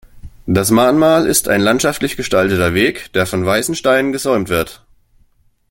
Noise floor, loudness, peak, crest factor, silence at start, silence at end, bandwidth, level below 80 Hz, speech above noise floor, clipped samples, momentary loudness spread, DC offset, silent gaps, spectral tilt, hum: -54 dBFS; -14 LUFS; 0 dBFS; 14 dB; 0.15 s; 0.95 s; 17 kHz; -42 dBFS; 40 dB; under 0.1%; 7 LU; under 0.1%; none; -4 dB/octave; none